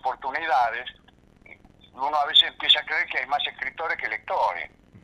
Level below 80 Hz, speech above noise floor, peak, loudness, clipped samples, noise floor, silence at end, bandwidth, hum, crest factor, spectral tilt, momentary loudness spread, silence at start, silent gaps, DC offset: -60 dBFS; 27 dB; -4 dBFS; -23 LUFS; under 0.1%; -52 dBFS; 0.05 s; 12.5 kHz; none; 22 dB; -1.5 dB/octave; 14 LU; 0.05 s; none; under 0.1%